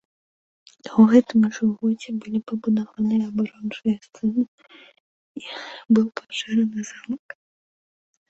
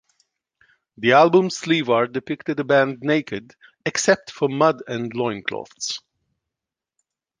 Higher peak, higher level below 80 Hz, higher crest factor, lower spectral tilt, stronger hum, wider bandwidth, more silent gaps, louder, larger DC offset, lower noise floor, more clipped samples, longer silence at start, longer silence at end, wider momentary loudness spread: about the same, -4 dBFS vs -2 dBFS; about the same, -64 dBFS vs -66 dBFS; about the same, 20 dB vs 20 dB; first, -6.5 dB/octave vs -4.5 dB/octave; neither; second, 7.8 kHz vs 10 kHz; first, 4.48-4.58 s, 5.00-5.35 s vs none; about the same, -22 LUFS vs -20 LUFS; neither; about the same, under -90 dBFS vs -87 dBFS; neither; second, 0.85 s vs 1 s; second, 1.1 s vs 1.4 s; first, 18 LU vs 13 LU